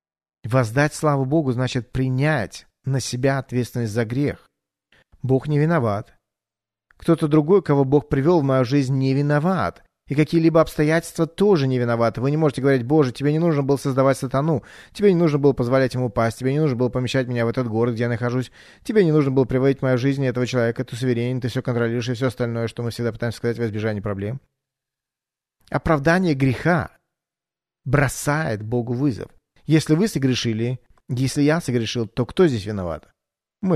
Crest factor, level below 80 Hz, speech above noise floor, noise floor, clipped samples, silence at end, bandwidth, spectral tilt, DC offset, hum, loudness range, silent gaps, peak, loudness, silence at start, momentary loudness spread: 16 dB; -48 dBFS; 70 dB; -90 dBFS; under 0.1%; 0 s; 13.5 kHz; -7 dB/octave; under 0.1%; none; 5 LU; none; -4 dBFS; -21 LUFS; 0.45 s; 9 LU